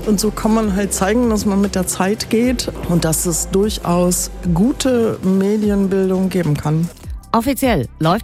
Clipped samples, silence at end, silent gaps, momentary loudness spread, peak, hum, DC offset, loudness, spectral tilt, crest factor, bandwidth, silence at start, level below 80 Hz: under 0.1%; 0 s; none; 3 LU; -2 dBFS; none; under 0.1%; -17 LUFS; -5 dB/octave; 14 dB; 16 kHz; 0 s; -32 dBFS